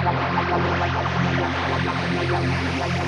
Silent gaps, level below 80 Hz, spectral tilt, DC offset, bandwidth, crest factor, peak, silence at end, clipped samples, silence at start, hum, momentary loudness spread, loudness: none; -40 dBFS; -6 dB/octave; under 0.1%; 10 kHz; 14 dB; -8 dBFS; 0 s; under 0.1%; 0 s; none; 2 LU; -22 LUFS